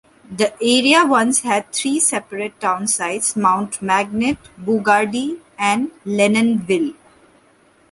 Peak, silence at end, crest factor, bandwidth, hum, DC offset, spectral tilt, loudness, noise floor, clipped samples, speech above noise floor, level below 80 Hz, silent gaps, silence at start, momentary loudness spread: -2 dBFS; 1 s; 18 dB; 12 kHz; none; under 0.1%; -3 dB/octave; -17 LUFS; -54 dBFS; under 0.1%; 36 dB; -58 dBFS; none; 0.3 s; 10 LU